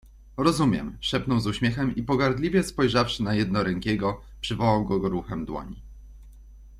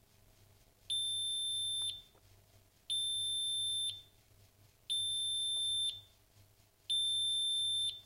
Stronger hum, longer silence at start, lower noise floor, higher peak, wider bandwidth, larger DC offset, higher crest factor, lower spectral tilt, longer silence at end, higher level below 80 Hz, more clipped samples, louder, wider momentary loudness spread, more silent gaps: neither; second, 0.05 s vs 0.9 s; second, -47 dBFS vs -66 dBFS; first, -6 dBFS vs -28 dBFS; second, 14 kHz vs 16 kHz; neither; first, 20 dB vs 12 dB; first, -6 dB/octave vs 1.5 dB/octave; about the same, 0 s vs 0.05 s; first, -44 dBFS vs -72 dBFS; neither; first, -25 LUFS vs -34 LUFS; first, 10 LU vs 7 LU; neither